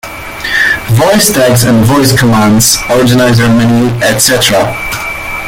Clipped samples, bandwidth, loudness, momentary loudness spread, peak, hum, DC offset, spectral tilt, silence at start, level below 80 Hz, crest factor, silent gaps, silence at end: 0.2%; over 20 kHz; -7 LUFS; 9 LU; 0 dBFS; none; under 0.1%; -4 dB/octave; 0.05 s; -30 dBFS; 8 dB; none; 0 s